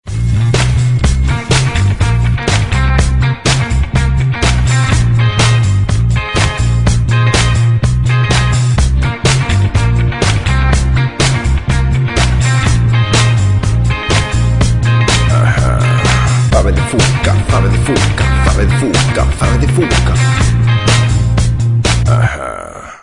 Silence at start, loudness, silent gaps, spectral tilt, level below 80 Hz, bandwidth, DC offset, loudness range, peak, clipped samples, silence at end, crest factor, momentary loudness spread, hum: 0.05 s; -12 LUFS; none; -5 dB/octave; -18 dBFS; 11 kHz; under 0.1%; 1 LU; 0 dBFS; under 0.1%; 0.05 s; 10 dB; 3 LU; none